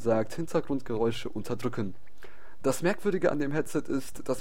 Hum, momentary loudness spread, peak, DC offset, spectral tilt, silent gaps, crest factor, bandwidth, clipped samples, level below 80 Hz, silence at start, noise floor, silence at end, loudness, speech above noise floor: none; 8 LU; -12 dBFS; 2%; -6 dB/octave; none; 18 dB; 16.5 kHz; under 0.1%; -54 dBFS; 0 s; -53 dBFS; 0 s; -31 LUFS; 24 dB